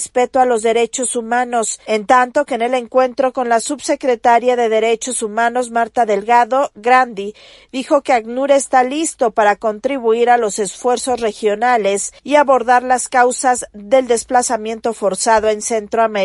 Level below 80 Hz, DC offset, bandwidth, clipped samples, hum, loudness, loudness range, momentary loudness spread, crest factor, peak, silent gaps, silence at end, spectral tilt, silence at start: -54 dBFS; under 0.1%; 11.5 kHz; under 0.1%; none; -15 LUFS; 1 LU; 6 LU; 14 dB; 0 dBFS; none; 0 s; -2.5 dB/octave; 0 s